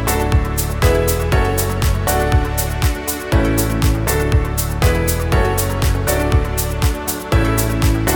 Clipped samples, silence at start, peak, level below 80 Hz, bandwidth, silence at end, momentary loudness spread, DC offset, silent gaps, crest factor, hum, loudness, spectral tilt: under 0.1%; 0 s; 0 dBFS; -20 dBFS; 19.5 kHz; 0 s; 3 LU; under 0.1%; none; 14 dB; none; -17 LUFS; -5 dB/octave